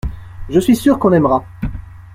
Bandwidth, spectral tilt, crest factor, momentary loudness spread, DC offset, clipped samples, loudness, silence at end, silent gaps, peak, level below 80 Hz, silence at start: 16 kHz; -7 dB/octave; 14 dB; 18 LU; under 0.1%; under 0.1%; -14 LUFS; 0.05 s; none; -2 dBFS; -32 dBFS; 0.05 s